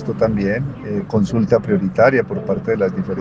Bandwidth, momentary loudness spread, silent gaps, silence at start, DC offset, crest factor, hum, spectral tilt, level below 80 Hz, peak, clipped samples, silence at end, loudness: 7.6 kHz; 8 LU; none; 0 s; under 0.1%; 16 dB; none; -8.5 dB/octave; -44 dBFS; 0 dBFS; under 0.1%; 0 s; -18 LUFS